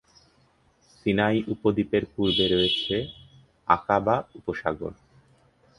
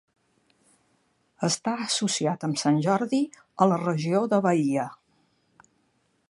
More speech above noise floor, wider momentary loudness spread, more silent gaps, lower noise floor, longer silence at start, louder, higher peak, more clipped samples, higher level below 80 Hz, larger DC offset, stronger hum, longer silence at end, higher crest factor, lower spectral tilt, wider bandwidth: second, 38 dB vs 45 dB; first, 12 LU vs 6 LU; neither; second, -63 dBFS vs -70 dBFS; second, 1.05 s vs 1.4 s; about the same, -25 LUFS vs -25 LUFS; about the same, -4 dBFS vs -6 dBFS; neither; first, -52 dBFS vs -74 dBFS; neither; neither; second, 0.85 s vs 1.35 s; about the same, 24 dB vs 22 dB; first, -6.5 dB/octave vs -5 dB/octave; about the same, 11 kHz vs 11.5 kHz